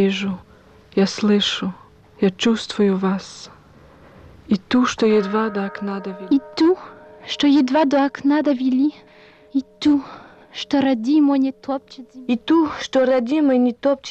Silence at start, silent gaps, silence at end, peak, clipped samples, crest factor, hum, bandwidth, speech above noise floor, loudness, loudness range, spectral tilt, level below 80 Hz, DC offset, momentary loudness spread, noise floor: 0 s; none; 0 s; -8 dBFS; under 0.1%; 12 dB; none; 8.6 kHz; 29 dB; -19 LUFS; 3 LU; -5.5 dB/octave; -56 dBFS; under 0.1%; 12 LU; -47 dBFS